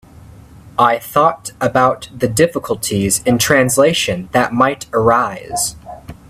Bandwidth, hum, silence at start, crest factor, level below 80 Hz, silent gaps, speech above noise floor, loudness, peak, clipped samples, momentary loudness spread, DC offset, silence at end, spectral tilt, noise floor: 16 kHz; none; 0.65 s; 16 dB; -44 dBFS; none; 25 dB; -15 LUFS; 0 dBFS; under 0.1%; 8 LU; under 0.1%; 0.15 s; -4 dB/octave; -39 dBFS